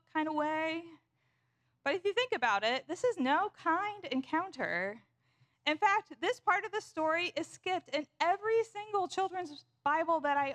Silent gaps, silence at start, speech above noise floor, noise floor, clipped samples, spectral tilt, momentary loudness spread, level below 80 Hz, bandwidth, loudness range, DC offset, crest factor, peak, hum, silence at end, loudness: none; 0.15 s; 44 dB; -78 dBFS; under 0.1%; -3.5 dB/octave; 8 LU; -82 dBFS; 12 kHz; 2 LU; under 0.1%; 18 dB; -16 dBFS; none; 0 s; -33 LUFS